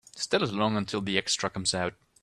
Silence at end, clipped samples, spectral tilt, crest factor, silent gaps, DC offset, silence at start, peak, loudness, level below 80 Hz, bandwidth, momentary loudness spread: 0.3 s; under 0.1%; -3.5 dB/octave; 22 dB; none; under 0.1%; 0.15 s; -8 dBFS; -28 LUFS; -62 dBFS; 12.5 kHz; 4 LU